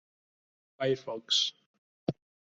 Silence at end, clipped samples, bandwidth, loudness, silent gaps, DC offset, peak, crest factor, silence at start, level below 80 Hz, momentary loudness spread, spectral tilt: 0.4 s; under 0.1%; 8.2 kHz; -31 LUFS; 1.66-2.07 s; under 0.1%; -14 dBFS; 22 dB; 0.8 s; -74 dBFS; 11 LU; -3 dB/octave